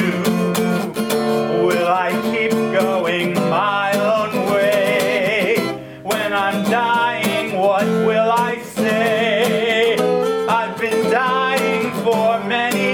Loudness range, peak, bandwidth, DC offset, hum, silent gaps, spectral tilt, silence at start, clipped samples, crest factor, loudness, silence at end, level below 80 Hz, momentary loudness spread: 1 LU; -4 dBFS; over 20 kHz; under 0.1%; none; none; -5 dB/octave; 0 s; under 0.1%; 14 dB; -17 LUFS; 0 s; -58 dBFS; 3 LU